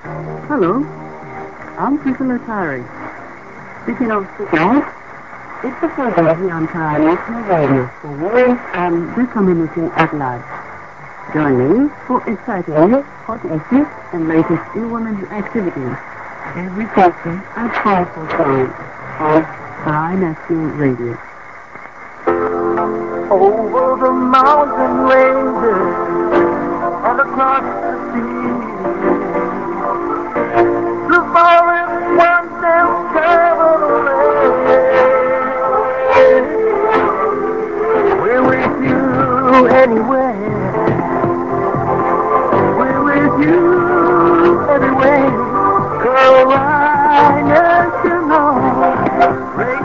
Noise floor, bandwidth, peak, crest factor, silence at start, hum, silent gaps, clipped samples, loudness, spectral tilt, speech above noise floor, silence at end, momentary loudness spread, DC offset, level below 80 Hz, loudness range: -34 dBFS; 7.4 kHz; 0 dBFS; 14 dB; 0.05 s; none; none; under 0.1%; -14 LUFS; -8 dB/octave; 19 dB; 0 s; 15 LU; 0.8%; -44 dBFS; 8 LU